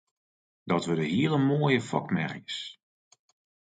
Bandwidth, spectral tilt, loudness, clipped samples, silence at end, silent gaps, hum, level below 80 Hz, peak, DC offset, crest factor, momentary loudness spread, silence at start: 9.2 kHz; -6.5 dB/octave; -28 LUFS; under 0.1%; 0.95 s; none; none; -68 dBFS; -10 dBFS; under 0.1%; 20 dB; 11 LU; 0.65 s